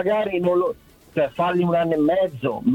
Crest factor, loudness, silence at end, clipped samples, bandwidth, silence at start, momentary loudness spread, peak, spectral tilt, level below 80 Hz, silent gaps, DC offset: 12 dB; -21 LUFS; 0 s; under 0.1%; 16 kHz; 0 s; 7 LU; -8 dBFS; -8 dB/octave; -54 dBFS; none; under 0.1%